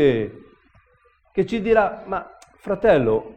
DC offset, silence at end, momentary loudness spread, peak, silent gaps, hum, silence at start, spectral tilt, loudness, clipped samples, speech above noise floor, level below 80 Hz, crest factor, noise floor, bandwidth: under 0.1%; 0.05 s; 12 LU; -2 dBFS; none; none; 0 s; -7.5 dB/octave; -21 LUFS; under 0.1%; 40 dB; -46 dBFS; 20 dB; -59 dBFS; 8.8 kHz